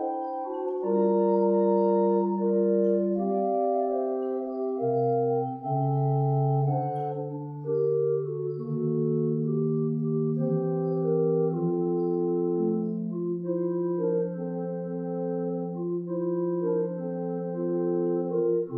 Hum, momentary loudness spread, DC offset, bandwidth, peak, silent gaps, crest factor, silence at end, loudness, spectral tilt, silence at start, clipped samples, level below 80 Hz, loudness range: none; 8 LU; under 0.1%; 2.3 kHz; -12 dBFS; none; 14 dB; 0 s; -27 LUFS; -14 dB/octave; 0 s; under 0.1%; -80 dBFS; 5 LU